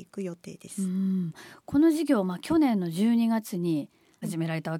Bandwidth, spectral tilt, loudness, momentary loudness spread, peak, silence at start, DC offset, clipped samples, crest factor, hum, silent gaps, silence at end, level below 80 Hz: 16.5 kHz; -6.5 dB/octave; -27 LUFS; 15 LU; -12 dBFS; 0 s; under 0.1%; under 0.1%; 14 dB; none; none; 0 s; -64 dBFS